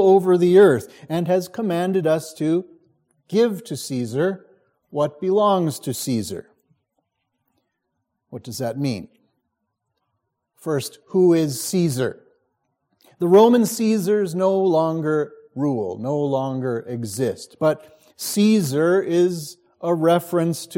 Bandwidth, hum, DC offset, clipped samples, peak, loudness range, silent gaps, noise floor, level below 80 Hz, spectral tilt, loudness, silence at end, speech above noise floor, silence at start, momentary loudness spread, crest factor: 16.5 kHz; none; under 0.1%; under 0.1%; -2 dBFS; 12 LU; none; -77 dBFS; -68 dBFS; -6 dB/octave; -20 LUFS; 0 s; 57 dB; 0 s; 13 LU; 18 dB